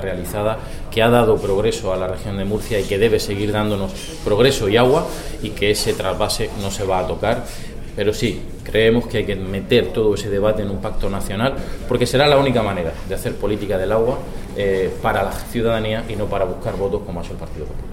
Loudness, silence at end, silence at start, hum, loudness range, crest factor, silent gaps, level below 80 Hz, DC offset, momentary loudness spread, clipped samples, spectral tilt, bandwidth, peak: -19 LUFS; 0 s; 0 s; none; 3 LU; 18 dB; none; -30 dBFS; 0.4%; 12 LU; under 0.1%; -5 dB/octave; 16.5 kHz; 0 dBFS